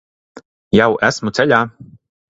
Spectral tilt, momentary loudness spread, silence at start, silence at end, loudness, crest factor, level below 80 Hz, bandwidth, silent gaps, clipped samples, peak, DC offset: -5 dB/octave; 4 LU; 0.35 s; 0.5 s; -15 LUFS; 18 dB; -50 dBFS; 8 kHz; 0.45-0.71 s; under 0.1%; 0 dBFS; under 0.1%